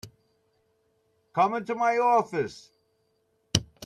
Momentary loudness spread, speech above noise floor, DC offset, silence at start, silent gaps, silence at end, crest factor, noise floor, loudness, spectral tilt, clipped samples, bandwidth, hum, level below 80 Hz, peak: 10 LU; 47 dB; under 0.1%; 0.05 s; none; 0 s; 28 dB; -72 dBFS; -26 LUFS; -4 dB/octave; under 0.1%; 14.5 kHz; none; -58 dBFS; -2 dBFS